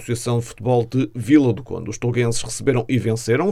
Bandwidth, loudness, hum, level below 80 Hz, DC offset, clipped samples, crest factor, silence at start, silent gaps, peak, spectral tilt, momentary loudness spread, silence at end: 13.5 kHz; -20 LUFS; none; -46 dBFS; under 0.1%; under 0.1%; 18 dB; 0 s; none; -2 dBFS; -6 dB/octave; 8 LU; 0 s